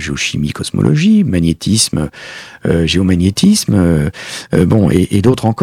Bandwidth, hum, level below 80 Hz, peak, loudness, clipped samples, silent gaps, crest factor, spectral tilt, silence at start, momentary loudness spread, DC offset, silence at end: 15.5 kHz; none; -34 dBFS; 0 dBFS; -13 LUFS; 0.1%; none; 12 dB; -5.5 dB/octave; 0 s; 9 LU; under 0.1%; 0 s